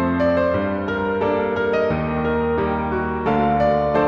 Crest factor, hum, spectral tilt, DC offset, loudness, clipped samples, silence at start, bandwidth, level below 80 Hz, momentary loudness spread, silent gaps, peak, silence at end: 12 dB; none; -8.5 dB/octave; under 0.1%; -20 LUFS; under 0.1%; 0 s; 7 kHz; -38 dBFS; 4 LU; none; -6 dBFS; 0 s